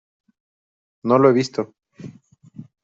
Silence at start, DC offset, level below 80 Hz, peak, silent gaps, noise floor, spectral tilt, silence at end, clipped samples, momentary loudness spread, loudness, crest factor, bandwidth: 1.05 s; under 0.1%; -64 dBFS; -4 dBFS; none; -48 dBFS; -7 dB/octave; 0.2 s; under 0.1%; 26 LU; -18 LUFS; 20 dB; 7.8 kHz